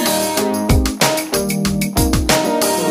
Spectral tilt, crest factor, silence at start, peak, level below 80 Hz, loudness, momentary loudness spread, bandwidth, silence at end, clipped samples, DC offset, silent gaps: -4 dB/octave; 16 dB; 0 s; 0 dBFS; -26 dBFS; -16 LUFS; 4 LU; 16 kHz; 0 s; under 0.1%; under 0.1%; none